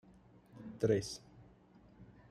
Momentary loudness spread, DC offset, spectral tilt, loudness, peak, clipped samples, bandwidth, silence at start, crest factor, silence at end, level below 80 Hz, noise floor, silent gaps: 26 LU; under 0.1%; -6 dB/octave; -37 LUFS; -18 dBFS; under 0.1%; 14 kHz; 0.55 s; 22 dB; 0.25 s; -68 dBFS; -63 dBFS; none